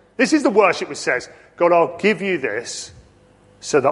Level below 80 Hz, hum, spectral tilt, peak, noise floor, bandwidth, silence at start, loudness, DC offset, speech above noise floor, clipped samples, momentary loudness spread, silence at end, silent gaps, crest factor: -60 dBFS; none; -4 dB/octave; -2 dBFS; -51 dBFS; 11.5 kHz; 0.2 s; -18 LUFS; under 0.1%; 33 dB; under 0.1%; 15 LU; 0 s; none; 18 dB